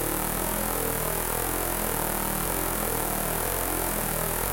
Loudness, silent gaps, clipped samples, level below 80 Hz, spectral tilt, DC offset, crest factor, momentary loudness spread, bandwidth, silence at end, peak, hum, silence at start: -26 LUFS; none; under 0.1%; -38 dBFS; -3 dB/octave; under 0.1%; 20 dB; 0 LU; 17.5 kHz; 0 s; -8 dBFS; none; 0 s